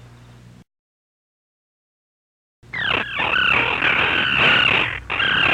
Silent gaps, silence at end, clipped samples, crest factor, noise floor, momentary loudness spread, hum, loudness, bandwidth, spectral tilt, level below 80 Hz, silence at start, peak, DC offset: 0.79-2.62 s; 0 s; under 0.1%; 16 dB; -45 dBFS; 8 LU; none; -17 LUFS; 13 kHz; -4 dB/octave; -46 dBFS; 0 s; -6 dBFS; under 0.1%